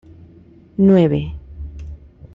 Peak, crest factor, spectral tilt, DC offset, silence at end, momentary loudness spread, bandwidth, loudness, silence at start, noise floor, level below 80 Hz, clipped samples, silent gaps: -4 dBFS; 16 dB; -10 dB/octave; under 0.1%; 0.1 s; 23 LU; 4.1 kHz; -15 LUFS; 0.8 s; -46 dBFS; -38 dBFS; under 0.1%; none